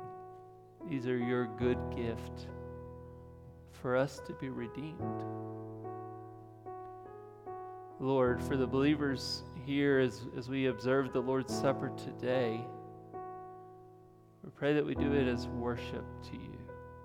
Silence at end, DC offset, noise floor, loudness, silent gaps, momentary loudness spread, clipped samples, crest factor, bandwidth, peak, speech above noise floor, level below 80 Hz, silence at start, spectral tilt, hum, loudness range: 0 s; under 0.1%; -59 dBFS; -35 LUFS; none; 20 LU; under 0.1%; 18 dB; 15.5 kHz; -18 dBFS; 25 dB; -60 dBFS; 0 s; -6.5 dB/octave; none; 7 LU